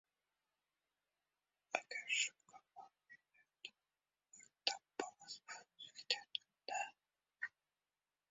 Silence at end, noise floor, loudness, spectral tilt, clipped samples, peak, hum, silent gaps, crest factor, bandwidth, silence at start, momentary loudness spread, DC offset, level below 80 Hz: 0.8 s; under -90 dBFS; -44 LUFS; 3.5 dB/octave; under 0.1%; -18 dBFS; none; none; 32 dB; 7.6 kHz; 1.75 s; 23 LU; under 0.1%; under -90 dBFS